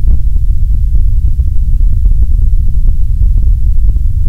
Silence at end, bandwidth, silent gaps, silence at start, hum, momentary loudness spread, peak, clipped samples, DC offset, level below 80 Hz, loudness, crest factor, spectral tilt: 0 s; 0.7 kHz; none; 0 s; none; 2 LU; 0 dBFS; 3%; under 0.1%; -8 dBFS; -14 LUFS; 6 dB; -9.5 dB/octave